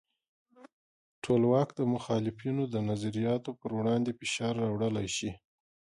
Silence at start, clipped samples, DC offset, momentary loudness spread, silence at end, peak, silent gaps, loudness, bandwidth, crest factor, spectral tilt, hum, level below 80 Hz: 0.6 s; under 0.1%; under 0.1%; 7 LU; 0.6 s; -14 dBFS; 0.73-1.22 s; -31 LUFS; 11.5 kHz; 18 dB; -6 dB/octave; none; -64 dBFS